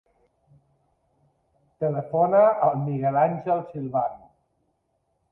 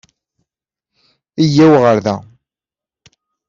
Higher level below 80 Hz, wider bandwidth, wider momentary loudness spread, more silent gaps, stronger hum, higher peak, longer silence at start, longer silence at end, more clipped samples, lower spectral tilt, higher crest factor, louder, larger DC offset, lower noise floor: second, -68 dBFS vs -54 dBFS; second, 3.7 kHz vs 7.4 kHz; second, 10 LU vs 16 LU; neither; neither; second, -8 dBFS vs -2 dBFS; first, 1.8 s vs 1.4 s; about the same, 1.15 s vs 1.25 s; neither; first, -11.5 dB/octave vs -7 dB/octave; about the same, 18 dB vs 14 dB; second, -23 LUFS vs -11 LUFS; neither; second, -73 dBFS vs -89 dBFS